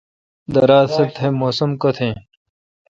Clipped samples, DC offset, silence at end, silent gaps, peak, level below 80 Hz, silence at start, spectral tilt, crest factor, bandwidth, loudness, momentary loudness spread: under 0.1%; under 0.1%; 0.7 s; none; 0 dBFS; -52 dBFS; 0.5 s; -7.5 dB/octave; 18 dB; 7.6 kHz; -17 LUFS; 10 LU